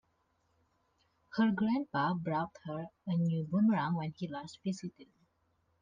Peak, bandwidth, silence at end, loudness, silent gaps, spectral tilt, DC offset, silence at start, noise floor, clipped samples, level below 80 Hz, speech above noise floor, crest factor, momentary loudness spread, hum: -20 dBFS; 9 kHz; 0.8 s; -34 LUFS; none; -7.5 dB/octave; under 0.1%; 1.3 s; -76 dBFS; under 0.1%; -74 dBFS; 43 dB; 16 dB; 12 LU; none